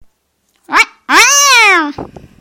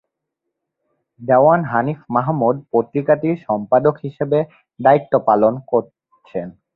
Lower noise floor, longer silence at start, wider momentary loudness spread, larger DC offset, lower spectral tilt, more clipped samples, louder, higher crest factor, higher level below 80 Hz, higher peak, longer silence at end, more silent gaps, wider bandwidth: second, -61 dBFS vs -79 dBFS; second, 0.7 s vs 1.2 s; about the same, 13 LU vs 14 LU; neither; second, 0.5 dB/octave vs -11 dB/octave; first, 0.5% vs under 0.1%; first, -7 LUFS vs -17 LUFS; about the same, 12 dB vs 16 dB; first, -48 dBFS vs -58 dBFS; about the same, 0 dBFS vs -2 dBFS; about the same, 0.35 s vs 0.25 s; neither; first, over 20 kHz vs 4.2 kHz